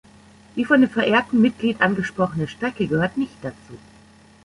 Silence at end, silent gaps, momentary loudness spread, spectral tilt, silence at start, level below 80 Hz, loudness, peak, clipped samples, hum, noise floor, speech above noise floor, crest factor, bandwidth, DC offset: 0.7 s; none; 12 LU; -6.5 dB/octave; 0.55 s; -54 dBFS; -20 LUFS; -4 dBFS; under 0.1%; none; -50 dBFS; 29 dB; 18 dB; 11 kHz; under 0.1%